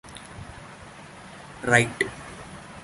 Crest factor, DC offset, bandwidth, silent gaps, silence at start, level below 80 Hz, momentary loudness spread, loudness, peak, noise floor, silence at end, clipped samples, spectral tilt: 26 dB; under 0.1%; 11.5 kHz; none; 0.05 s; -54 dBFS; 23 LU; -23 LUFS; -2 dBFS; -44 dBFS; 0 s; under 0.1%; -4 dB/octave